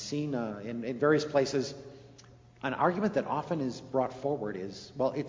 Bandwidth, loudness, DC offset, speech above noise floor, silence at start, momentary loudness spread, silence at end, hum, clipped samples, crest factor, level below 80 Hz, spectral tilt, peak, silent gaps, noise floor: 7.6 kHz; -32 LUFS; under 0.1%; 24 dB; 0 s; 12 LU; 0 s; none; under 0.1%; 20 dB; -66 dBFS; -6 dB/octave; -12 dBFS; none; -55 dBFS